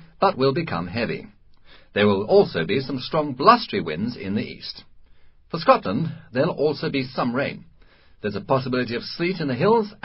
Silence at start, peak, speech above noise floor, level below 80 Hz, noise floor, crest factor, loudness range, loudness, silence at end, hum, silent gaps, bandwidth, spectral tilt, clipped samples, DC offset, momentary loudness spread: 0 s; 0 dBFS; 29 dB; -54 dBFS; -51 dBFS; 22 dB; 4 LU; -22 LUFS; 0.1 s; none; none; 5.8 kHz; -10.5 dB/octave; under 0.1%; under 0.1%; 12 LU